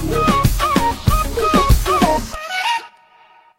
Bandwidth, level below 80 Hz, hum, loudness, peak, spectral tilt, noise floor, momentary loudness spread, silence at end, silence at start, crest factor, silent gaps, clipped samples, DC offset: 16.5 kHz; -24 dBFS; none; -17 LUFS; 0 dBFS; -5 dB/octave; -49 dBFS; 6 LU; 0.7 s; 0 s; 16 dB; none; under 0.1%; under 0.1%